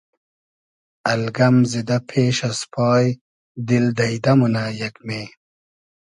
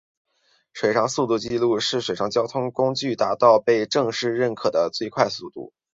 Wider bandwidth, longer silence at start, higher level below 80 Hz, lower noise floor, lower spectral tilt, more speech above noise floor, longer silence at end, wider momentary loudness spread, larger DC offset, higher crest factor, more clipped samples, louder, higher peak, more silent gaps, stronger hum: first, 11 kHz vs 7.8 kHz; first, 1.05 s vs 0.75 s; about the same, -58 dBFS vs -62 dBFS; first, under -90 dBFS vs -59 dBFS; first, -6 dB/octave vs -4.5 dB/octave; first, over 71 dB vs 38 dB; first, 0.75 s vs 0.3 s; first, 13 LU vs 8 LU; neither; about the same, 18 dB vs 20 dB; neither; first, -19 LUFS vs -22 LUFS; about the same, -4 dBFS vs -2 dBFS; first, 3.21-3.55 s vs none; neither